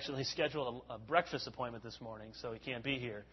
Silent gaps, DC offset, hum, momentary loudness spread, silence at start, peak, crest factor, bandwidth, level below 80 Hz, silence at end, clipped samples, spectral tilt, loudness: none; under 0.1%; none; 13 LU; 0 s; -14 dBFS; 26 dB; 6 kHz; -66 dBFS; 0 s; under 0.1%; -3 dB/octave; -39 LUFS